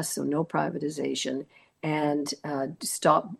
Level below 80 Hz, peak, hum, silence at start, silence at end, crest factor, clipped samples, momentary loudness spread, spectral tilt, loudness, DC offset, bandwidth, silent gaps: -74 dBFS; -8 dBFS; none; 0 s; 0.05 s; 22 dB; under 0.1%; 8 LU; -4.5 dB/octave; -29 LUFS; under 0.1%; 12.5 kHz; none